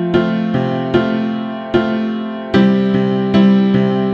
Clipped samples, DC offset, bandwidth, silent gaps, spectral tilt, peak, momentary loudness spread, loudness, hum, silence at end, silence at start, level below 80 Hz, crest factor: under 0.1%; under 0.1%; 6.2 kHz; none; -8.5 dB/octave; 0 dBFS; 8 LU; -15 LUFS; none; 0 s; 0 s; -44 dBFS; 14 dB